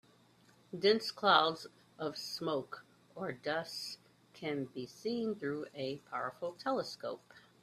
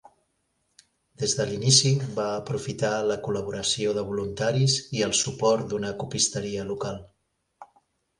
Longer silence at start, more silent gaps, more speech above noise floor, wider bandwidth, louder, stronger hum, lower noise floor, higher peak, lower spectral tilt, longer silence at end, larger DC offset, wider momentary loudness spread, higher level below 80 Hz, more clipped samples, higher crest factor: second, 0.7 s vs 1.2 s; neither; second, 30 dB vs 49 dB; first, 14 kHz vs 11.5 kHz; second, -36 LUFS vs -25 LUFS; neither; second, -66 dBFS vs -74 dBFS; second, -12 dBFS vs -4 dBFS; about the same, -4 dB/octave vs -3.5 dB/octave; second, 0.25 s vs 0.55 s; neither; first, 19 LU vs 12 LU; second, -80 dBFS vs -56 dBFS; neither; about the same, 26 dB vs 22 dB